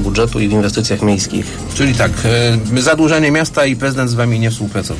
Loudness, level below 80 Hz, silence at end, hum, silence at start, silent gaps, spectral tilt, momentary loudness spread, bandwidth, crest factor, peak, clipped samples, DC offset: -14 LUFS; -30 dBFS; 0 s; none; 0 s; none; -5 dB/octave; 5 LU; 11 kHz; 12 dB; -2 dBFS; under 0.1%; under 0.1%